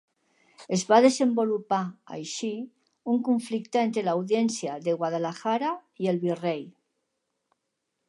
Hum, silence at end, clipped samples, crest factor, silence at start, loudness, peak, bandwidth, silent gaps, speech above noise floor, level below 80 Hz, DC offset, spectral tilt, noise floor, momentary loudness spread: none; 1.4 s; under 0.1%; 22 dB; 0.6 s; -26 LUFS; -6 dBFS; 11.5 kHz; none; 55 dB; -80 dBFS; under 0.1%; -5 dB/octave; -81 dBFS; 14 LU